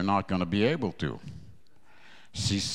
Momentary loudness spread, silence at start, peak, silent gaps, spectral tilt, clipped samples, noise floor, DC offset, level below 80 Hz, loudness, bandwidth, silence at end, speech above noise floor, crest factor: 18 LU; 0 s; -12 dBFS; none; -5 dB/octave; under 0.1%; -61 dBFS; 0.4%; -54 dBFS; -29 LUFS; 12.5 kHz; 0 s; 32 dB; 18 dB